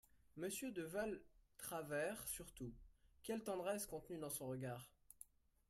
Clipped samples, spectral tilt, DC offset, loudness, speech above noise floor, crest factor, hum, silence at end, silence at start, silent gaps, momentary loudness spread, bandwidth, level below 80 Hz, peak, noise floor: under 0.1%; -4 dB/octave; under 0.1%; -48 LUFS; 20 dB; 18 dB; none; 0.45 s; 0.15 s; none; 17 LU; 16 kHz; -70 dBFS; -32 dBFS; -67 dBFS